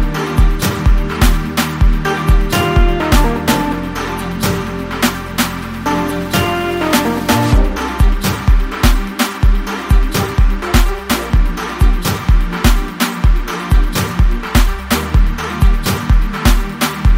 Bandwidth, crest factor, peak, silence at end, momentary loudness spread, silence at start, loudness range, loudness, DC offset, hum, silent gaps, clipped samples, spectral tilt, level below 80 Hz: 16.5 kHz; 12 dB; 0 dBFS; 0 s; 4 LU; 0 s; 2 LU; -15 LUFS; under 0.1%; none; none; under 0.1%; -5 dB/octave; -14 dBFS